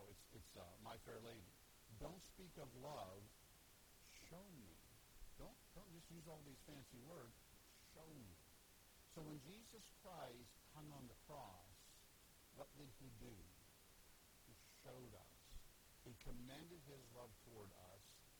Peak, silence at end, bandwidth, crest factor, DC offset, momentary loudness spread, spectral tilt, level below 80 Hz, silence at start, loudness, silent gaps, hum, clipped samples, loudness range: -40 dBFS; 0 s; over 20 kHz; 22 dB; under 0.1%; 10 LU; -4.5 dB/octave; -70 dBFS; 0 s; -62 LUFS; none; none; under 0.1%; 5 LU